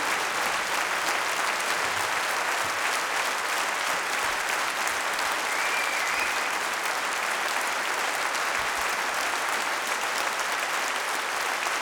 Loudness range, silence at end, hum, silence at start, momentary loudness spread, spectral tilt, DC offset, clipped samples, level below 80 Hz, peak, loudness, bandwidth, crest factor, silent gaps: 1 LU; 0 s; none; 0 s; 2 LU; 0.5 dB/octave; under 0.1%; under 0.1%; -64 dBFS; -8 dBFS; -26 LUFS; over 20 kHz; 20 dB; none